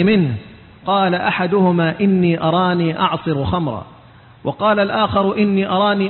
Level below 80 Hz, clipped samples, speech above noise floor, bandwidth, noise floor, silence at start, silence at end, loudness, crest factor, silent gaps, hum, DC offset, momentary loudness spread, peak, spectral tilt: -44 dBFS; under 0.1%; 28 dB; 4.3 kHz; -44 dBFS; 0 s; 0 s; -17 LUFS; 14 dB; none; none; under 0.1%; 9 LU; -4 dBFS; -12 dB/octave